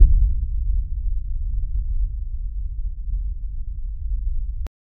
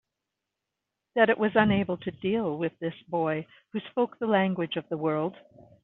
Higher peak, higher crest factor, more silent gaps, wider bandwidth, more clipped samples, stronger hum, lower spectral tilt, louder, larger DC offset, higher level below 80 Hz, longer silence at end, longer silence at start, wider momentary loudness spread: first, 0 dBFS vs -6 dBFS; about the same, 20 dB vs 22 dB; neither; second, 0.5 kHz vs 4.1 kHz; neither; neither; first, -11.5 dB/octave vs -4.5 dB/octave; about the same, -28 LUFS vs -28 LUFS; neither; first, -22 dBFS vs -64 dBFS; second, 0.3 s vs 0.5 s; second, 0 s vs 1.15 s; second, 8 LU vs 11 LU